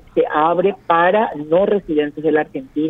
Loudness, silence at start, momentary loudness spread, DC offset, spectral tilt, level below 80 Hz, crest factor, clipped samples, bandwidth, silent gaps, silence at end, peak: -17 LUFS; 0.15 s; 5 LU; under 0.1%; -8.5 dB/octave; -52 dBFS; 16 dB; under 0.1%; 4 kHz; none; 0 s; -2 dBFS